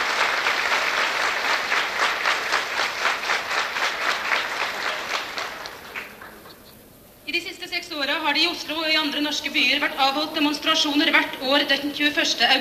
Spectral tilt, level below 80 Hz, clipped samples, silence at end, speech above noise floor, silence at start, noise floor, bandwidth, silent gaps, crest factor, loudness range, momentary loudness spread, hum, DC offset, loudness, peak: -1 dB/octave; -60 dBFS; under 0.1%; 0 s; 27 dB; 0 s; -48 dBFS; 15.5 kHz; none; 18 dB; 9 LU; 10 LU; none; under 0.1%; -21 LUFS; -6 dBFS